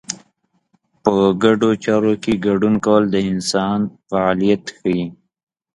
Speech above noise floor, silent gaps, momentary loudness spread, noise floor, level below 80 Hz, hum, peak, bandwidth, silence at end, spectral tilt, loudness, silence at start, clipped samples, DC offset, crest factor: 48 dB; none; 7 LU; -65 dBFS; -50 dBFS; none; 0 dBFS; 11.5 kHz; 0.6 s; -5.5 dB/octave; -17 LUFS; 0.1 s; under 0.1%; under 0.1%; 18 dB